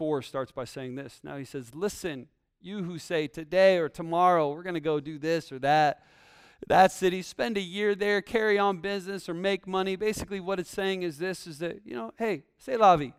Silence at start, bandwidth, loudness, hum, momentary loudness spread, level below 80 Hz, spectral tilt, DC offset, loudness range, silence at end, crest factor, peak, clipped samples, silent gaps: 0 s; 15.5 kHz; -28 LUFS; none; 16 LU; -60 dBFS; -5 dB/octave; under 0.1%; 6 LU; 0.05 s; 20 dB; -8 dBFS; under 0.1%; none